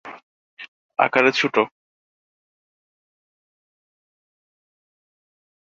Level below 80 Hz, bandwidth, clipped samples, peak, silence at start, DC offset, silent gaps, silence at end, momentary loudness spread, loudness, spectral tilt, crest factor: -74 dBFS; 7.8 kHz; under 0.1%; -2 dBFS; 0.05 s; under 0.1%; 0.23-0.57 s, 0.68-0.89 s; 4.1 s; 24 LU; -19 LUFS; -4 dB/octave; 26 dB